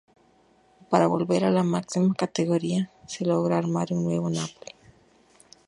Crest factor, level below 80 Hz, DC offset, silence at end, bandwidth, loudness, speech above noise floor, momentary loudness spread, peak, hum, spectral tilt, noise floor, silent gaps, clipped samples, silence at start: 22 dB; -66 dBFS; under 0.1%; 1.15 s; 11 kHz; -25 LUFS; 36 dB; 9 LU; -4 dBFS; none; -6.5 dB/octave; -61 dBFS; none; under 0.1%; 0.9 s